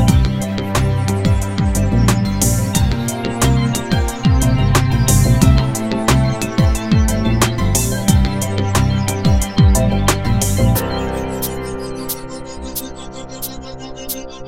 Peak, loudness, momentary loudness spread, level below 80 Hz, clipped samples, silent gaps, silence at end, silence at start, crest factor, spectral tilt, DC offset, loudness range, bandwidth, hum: 0 dBFS; -16 LUFS; 12 LU; -22 dBFS; under 0.1%; none; 0 s; 0 s; 16 dB; -5.5 dB/octave; under 0.1%; 6 LU; 16.5 kHz; none